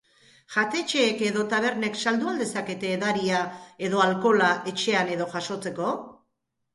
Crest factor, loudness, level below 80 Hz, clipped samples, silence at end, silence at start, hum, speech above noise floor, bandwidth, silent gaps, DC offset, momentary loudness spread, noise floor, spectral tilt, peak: 20 dB; -25 LUFS; -70 dBFS; under 0.1%; 0.6 s; 0.5 s; none; 53 dB; 11.5 kHz; none; under 0.1%; 9 LU; -78 dBFS; -4 dB/octave; -6 dBFS